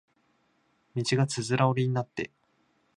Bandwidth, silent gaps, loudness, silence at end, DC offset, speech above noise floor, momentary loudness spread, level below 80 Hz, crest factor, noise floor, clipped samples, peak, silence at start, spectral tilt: 11 kHz; none; -28 LUFS; 0.7 s; under 0.1%; 43 dB; 12 LU; -68 dBFS; 22 dB; -70 dBFS; under 0.1%; -10 dBFS; 0.95 s; -5.5 dB/octave